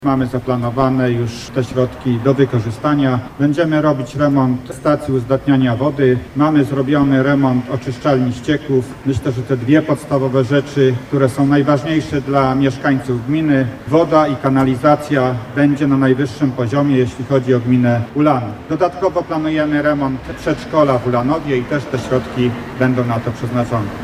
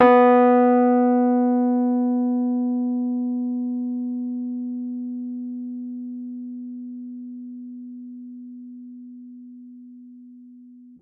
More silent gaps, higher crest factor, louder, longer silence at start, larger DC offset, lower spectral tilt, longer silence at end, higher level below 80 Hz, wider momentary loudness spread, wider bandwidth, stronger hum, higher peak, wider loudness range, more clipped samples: neither; about the same, 16 dB vs 18 dB; first, -16 LUFS vs -21 LUFS; about the same, 0 s vs 0 s; neither; second, -7.5 dB/octave vs -9 dB/octave; about the same, 0 s vs 0.1 s; first, -42 dBFS vs -74 dBFS; second, 6 LU vs 24 LU; first, 12.5 kHz vs 3.9 kHz; neither; first, 0 dBFS vs -4 dBFS; second, 2 LU vs 19 LU; neither